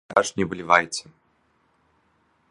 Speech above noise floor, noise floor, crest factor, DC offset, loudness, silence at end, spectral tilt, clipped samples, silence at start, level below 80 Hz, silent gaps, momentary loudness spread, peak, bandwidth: 43 dB; -66 dBFS; 26 dB; under 0.1%; -22 LUFS; 1.5 s; -3.5 dB/octave; under 0.1%; 0.1 s; -58 dBFS; none; 12 LU; 0 dBFS; 11.5 kHz